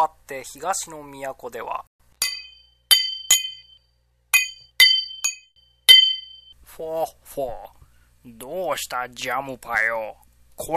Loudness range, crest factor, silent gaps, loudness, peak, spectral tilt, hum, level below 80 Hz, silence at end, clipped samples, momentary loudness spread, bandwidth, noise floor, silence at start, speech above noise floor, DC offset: 11 LU; 24 dB; 1.87-1.99 s; -19 LUFS; 0 dBFS; 1 dB/octave; 60 Hz at -70 dBFS; -56 dBFS; 0 s; under 0.1%; 21 LU; 14 kHz; -65 dBFS; 0 s; 37 dB; under 0.1%